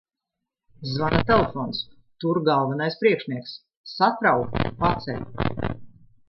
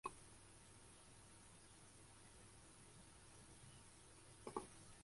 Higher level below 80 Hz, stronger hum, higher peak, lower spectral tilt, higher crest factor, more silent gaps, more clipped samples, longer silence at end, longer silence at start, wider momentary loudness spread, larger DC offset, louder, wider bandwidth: first, -44 dBFS vs -74 dBFS; neither; first, -4 dBFS vs -30 dBFS; first, -8 dB/octave vs -3.5 dB/octave; second, 20 dB vs 30 dB; first, 3.77-3.84 s vs none; neither; first, 0.4 s vs 0 s; first, 0.8 s vs 0.05 s; first, 16 LU vs 10 LU; neither; first, -24 LUFS vs -61 LUFS; second, 6 kHz vs 11.5 kHz